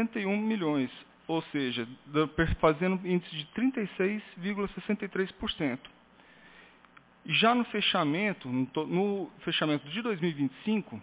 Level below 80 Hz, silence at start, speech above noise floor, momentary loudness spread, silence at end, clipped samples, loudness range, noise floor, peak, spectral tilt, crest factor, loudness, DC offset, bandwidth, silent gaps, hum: -50 dBFS; 0 s; 28 dB; 8 LU; 0 s; under 0.1%; 5 LU; -59 dBFS; -10 dBFS; -4 dB/octave; 20 dB; -30 LUFS; under 0.1%; 4 kHz; none; none